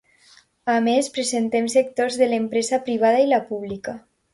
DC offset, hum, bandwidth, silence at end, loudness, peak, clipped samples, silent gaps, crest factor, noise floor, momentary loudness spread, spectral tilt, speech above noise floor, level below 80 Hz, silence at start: under 0.1%; none; 11.5 kHz; 0.35 s; -21 LUFS; -6 dBFS; under 0.1%; none; 14 dB; -55 dBFS; 12 LU; -3.5 dB/octave; 34 dB; -64 dBFS; 0.65 s